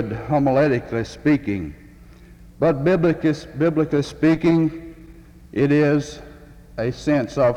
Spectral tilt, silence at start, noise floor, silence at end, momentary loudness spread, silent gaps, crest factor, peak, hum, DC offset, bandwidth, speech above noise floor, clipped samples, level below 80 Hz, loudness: -7.5 dB/octave; 0 s; -45 dBFS; 0 s; 13 LU; none; 14 dB; -6 dBFS; none; under 0.1%; 9.8 kHz; 25 dB; under 0.1%; -44 dBFS; -20 LUFS